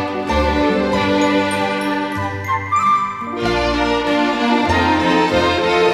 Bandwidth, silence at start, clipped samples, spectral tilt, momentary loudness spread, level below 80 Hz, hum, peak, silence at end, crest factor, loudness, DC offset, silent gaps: 13.5 kHz; 0 s; under 0.1%; -5 dB/octave; 6 LU; -34 dBFS; none; -4 dBFS; 0 s; 14 dB; -17 LUFS; under 0.1%; none